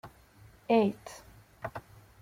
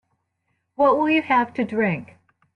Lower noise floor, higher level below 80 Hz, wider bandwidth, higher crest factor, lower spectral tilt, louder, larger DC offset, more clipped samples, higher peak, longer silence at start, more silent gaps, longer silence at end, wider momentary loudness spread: second, -57 dBFS vs -73 dBFS; about the same, -64 dBFS vs -66 dBFS; first, 16 kHz vs 6.4 kHz; about the same, 20 dB vs 16 dB; about the same, -6.5 dB/octave vs -7.5 dB/octave; second, -30 LUFS vs -21 LUFS; neither; neither; second, -14 dBFS vs -6 dBFS; second, 0.05 s vs 0.8 s; neither; about the same, 0.4 s vs 0.5 s; first, 24 LU vs 6 LU